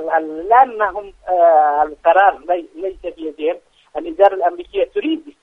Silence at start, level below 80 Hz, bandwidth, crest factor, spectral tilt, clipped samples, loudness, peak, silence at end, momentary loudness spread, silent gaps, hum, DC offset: 0 s; -52 dBFS; 3.9 kHz; 16 dB; -5.5 dB/octave; under 0.1%; -16 LUFS; 0 dBFS; 0.1 s; 15 LU; none; none; under 0.1%